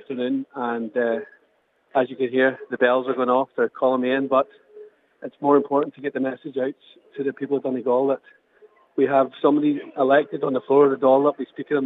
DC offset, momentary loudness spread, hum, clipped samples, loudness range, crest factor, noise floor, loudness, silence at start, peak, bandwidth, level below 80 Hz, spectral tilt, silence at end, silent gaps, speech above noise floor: under 0.1%; 11 LU; none; under 0.1%; 5 LU; 18 dB; -65 dBFS; -22 LUFS; 0.1 s; -4 dBFS; 4 kHz; -84 dBFS; -8.5 dB/octave; 0 s; none; 43 dB